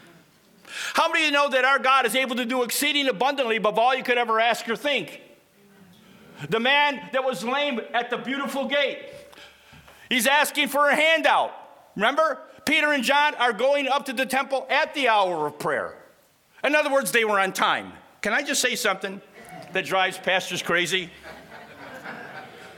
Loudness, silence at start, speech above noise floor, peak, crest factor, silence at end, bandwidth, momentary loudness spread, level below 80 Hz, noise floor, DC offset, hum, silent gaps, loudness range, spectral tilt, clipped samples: -22 LUFS; 0.65 s; 36 dB; -4 dBFS; 20 dB; 0 s; 19 kHz; 18 LU; -70 dBFS; -58 dBFS; under 0.1%; none; none; 4 LU; -2 dB/octave; under 0.1%